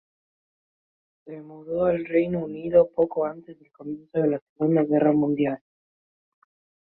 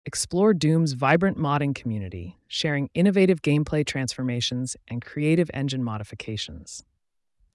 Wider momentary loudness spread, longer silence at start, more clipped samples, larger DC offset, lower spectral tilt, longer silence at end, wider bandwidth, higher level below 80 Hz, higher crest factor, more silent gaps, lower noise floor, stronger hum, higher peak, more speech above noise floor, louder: first, 20 LU vs 13 LU; first, 1.25 s vs 0.05 s; neither; neither; first, -12 dB/octave vs -5.5 dB/octave; first, 1.25 s vs 0.75 s; second, 4 kHz vs 12 kHz; second, -62 dBFS vs -54 dBFS; about the same, 18 dB vs 16 dB; first, 4.42-4.56 s vs none; first, under -90 dBFS vs -72 dBFS; neither; about the same, -6 dBFS vs -8 dBFS; first, over 66 dB vs 48 dB; about the same, -24 LUFS vs -24 LUFS